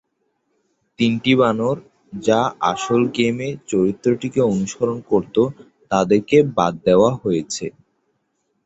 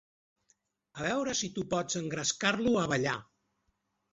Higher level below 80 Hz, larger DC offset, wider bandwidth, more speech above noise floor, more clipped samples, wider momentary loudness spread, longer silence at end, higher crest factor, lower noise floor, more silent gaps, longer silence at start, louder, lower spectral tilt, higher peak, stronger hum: first, -54 dBFS vs -64 dBFS; neither; about the same, 8.2 kHz vs 8.2 kHz; first, 52 dB vs 47 dB; neither; about the same, 8 LU vs 7 LU; about the same, 0.95 s vs 0.9 s; about the same, 18 dB vs 22 dB; second, -70 dBFS vs -79 dBFS; neither; about the same, 1 s vs 0.95 s; first, -19 LUFS vs -31 LUFS; first, -5.5 dB/octave vs -3.5 dB/octave; first, -2 dBFS vs -12 dBFS; neither